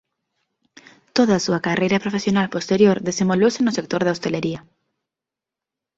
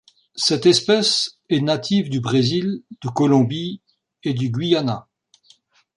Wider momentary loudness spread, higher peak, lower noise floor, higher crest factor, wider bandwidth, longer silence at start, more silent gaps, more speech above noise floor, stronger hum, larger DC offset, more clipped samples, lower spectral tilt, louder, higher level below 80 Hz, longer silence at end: second, 7 LU vs 13 LU; about the same, -4 dBFS vs -2 dBFS; first, -87 dBFS vs -56 dBFS; about the same, 18 dB vs 18 dB; second, 8 kHz vs 11.5 kHz; first, 1.15 s vs 0.35 s; neither; first, 68 dB vs 37 dB; neither; neither; neither; about the same, -5.5 dB/octave vs -5 dB/octave; about the same, -20 LUFS vs -19 LUFS; about the same, -58 dBFS vs -60 dBFS; first, 1.35 s vs 0.95 s